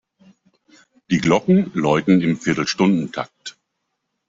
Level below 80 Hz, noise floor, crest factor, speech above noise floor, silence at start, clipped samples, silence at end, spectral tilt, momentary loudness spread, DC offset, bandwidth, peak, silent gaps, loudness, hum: -56 dBFS; -76 dBFS; 18 dB; 58 dB; 1.1 s; under 0.1%; 0.8 s; -6 dB/octave; 14 LU; under 0.1%; 7.8 kHz; -2 dBFS; none; -18 LUFS; none